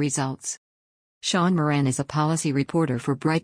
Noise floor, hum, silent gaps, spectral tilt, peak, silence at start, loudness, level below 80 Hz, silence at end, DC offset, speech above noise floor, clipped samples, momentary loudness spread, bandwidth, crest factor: under -90 dBFS; none; 0.57-1.21 s; -5 dB/octave; -10 dBFS; 0 s; -24 LUFS; -60 dBFS; 0 s; under 0.1%; over 67 dB; under 0.1%; 9 LU; 10.5 kHz; 14 dB